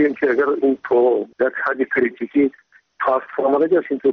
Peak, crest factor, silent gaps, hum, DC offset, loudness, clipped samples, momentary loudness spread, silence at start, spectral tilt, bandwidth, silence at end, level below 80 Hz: -6 dBFS; 12 dB; none; none; under 0.1%; -19 LUFS; under 0.1%; 5 LU; 0 s; -4.5 dB/octave; 5.4 kHz; 0 s; -64 dBFS